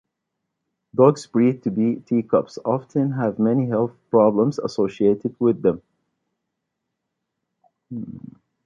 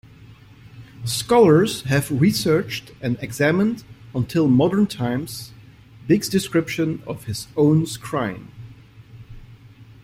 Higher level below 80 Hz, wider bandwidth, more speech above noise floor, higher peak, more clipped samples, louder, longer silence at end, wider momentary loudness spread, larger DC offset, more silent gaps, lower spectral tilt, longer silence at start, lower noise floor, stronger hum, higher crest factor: second, -62 dBFS vs -52 dBFS; second, 9.2 kHz vs 16.5 kHz; first, 60 dB vs 26 dB; about the same, -2 dBFS vs -2 dBFS; neither; about the same, -21 LUFS vs -20 LUFS; first, 0.45 s vs 0.2 s; about the same, 16 LU vs 15 LU; neither; neither; first, -8.5 dB/octave vs -6 dB/octave; first, 0.95 s vs 0.3 s; first, -80 dBFS vs -45 dBFS; neither; about the same, 20 dB vs 18 dB